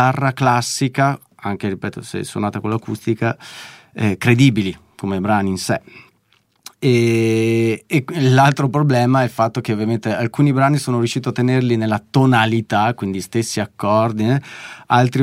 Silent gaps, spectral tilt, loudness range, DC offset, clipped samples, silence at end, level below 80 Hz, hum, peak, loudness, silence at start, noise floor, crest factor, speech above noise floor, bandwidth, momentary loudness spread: none; -6 dB/octave; 4 LU; under 0.1%; under 0.1%; 0 s; -58 dBFS; none; -2 dBFS; -18 LUFS; 0 s; -60 dBFS; 16 dB; 43 dB; 15.5 kHz; 10 LU